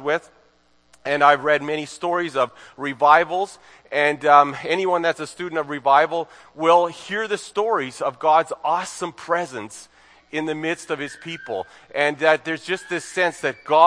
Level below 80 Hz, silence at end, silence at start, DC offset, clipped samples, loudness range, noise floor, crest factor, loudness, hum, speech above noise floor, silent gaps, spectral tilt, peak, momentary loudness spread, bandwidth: -70 dBFS; 0 s; 0 s; under 0.1%; under 0.1%; 6 LU; -59 dBFS; 20 dB; -21 LUFS; none; 38 dB; none; -4 dB/octave; 0 dBFS; 15 LU; 10.5 kHz